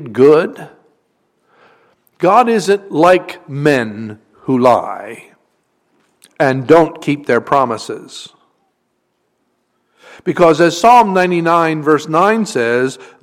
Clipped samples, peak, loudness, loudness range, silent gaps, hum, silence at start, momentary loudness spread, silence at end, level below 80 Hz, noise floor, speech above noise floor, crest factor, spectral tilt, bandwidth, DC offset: under 0.1%; 0 dBFS; -13 LUFS; 6 LU; none; none; 0 s; 17 LU; 0.2 s; -54 dBFS; -66 dBFS; 53 dB; 14 dB; -5.5 dB/octave; 15.5 kHz; under 0.1%